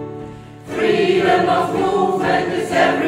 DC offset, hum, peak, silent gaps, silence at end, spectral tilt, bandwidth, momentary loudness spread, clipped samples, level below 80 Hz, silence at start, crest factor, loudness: under 0.1%; none; -2 dBFS; none; 0 s; -5.5 dB/octave; 15.5 kHz; 17 LU; under 0.1%; -50 dBFS; 0 s; 16 dB; -17 LUFS